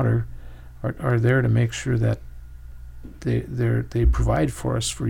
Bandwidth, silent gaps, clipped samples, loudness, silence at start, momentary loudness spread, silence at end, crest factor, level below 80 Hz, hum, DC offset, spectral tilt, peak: 12.5 kHz; none; under 0.1%; -23 LUFS; 0 s; 24 LU; 0 s; 16 dB; -32 dBFS; none; under 0.1%; -6.5 dB/octave; -8 dBFS